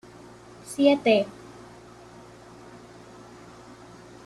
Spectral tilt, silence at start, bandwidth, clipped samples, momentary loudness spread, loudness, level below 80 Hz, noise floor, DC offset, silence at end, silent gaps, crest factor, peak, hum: -5 dB/octave; 0.7 s; 13 kHz; under 0.1%; 26 LU; -23 LUFS; -64 dBFS; -47 dBFS; under 0.1%; 2.95 s; none; 22 dB; -8 dBFS; none